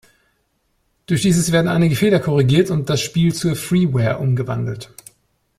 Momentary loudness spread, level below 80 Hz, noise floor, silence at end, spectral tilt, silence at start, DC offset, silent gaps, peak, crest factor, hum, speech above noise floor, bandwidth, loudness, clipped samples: 8 LU; -48 dBFS; -66 dBFS; 0.75 s; -6 dB/octave; 1.1 s; under 0.1%; none; -2 dBFS; 16 dB; none; 50 dB; 15.5 kHz; -17 LUFS; under 0.1%